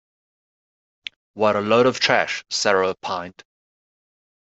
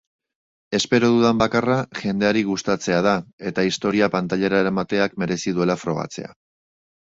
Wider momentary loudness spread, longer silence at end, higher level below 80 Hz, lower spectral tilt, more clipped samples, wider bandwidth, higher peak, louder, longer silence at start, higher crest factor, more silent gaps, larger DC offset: first, 20 LU vs 9 LU; first, 1.15 s vs 0.85 s; second, -66 dBFS vs -54 dBFS; second, -3.5 dB/octave vs -5 dB/octave; neither; about the same, 8.2 kHz vs 8 kHz; about the same, -2 dBFS vs -2 dBFS; about the same, -20 LUFS vs -21 LUFS; first, 1.35 s vs 0.7 s; about the same, 22 dB vs 20 dB; second, none vs 3.33-3.38 s; neither